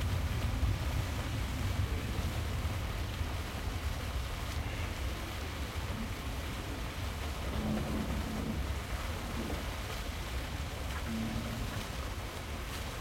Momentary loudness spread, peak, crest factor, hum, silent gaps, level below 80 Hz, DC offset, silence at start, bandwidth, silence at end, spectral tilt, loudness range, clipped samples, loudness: 5 LU; -20 dBFS; 16 dB; none; none; -40 dBFS; under 0.1%; 0 s; 16.5 kHz; 0 s; -5 dB/octave; 3 LU; under 0.1%; -38 LUFS